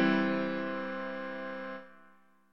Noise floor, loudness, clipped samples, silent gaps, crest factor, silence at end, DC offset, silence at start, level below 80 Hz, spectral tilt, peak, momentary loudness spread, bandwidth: -63 dBFS; -35 LUFS; under 0.1%; none; 18 dB; 0 s; under 0.1%; 0 s; -82 dBFS; -7.5 dB/octave; -16 dBFS; 13 LU; 6.6 kHz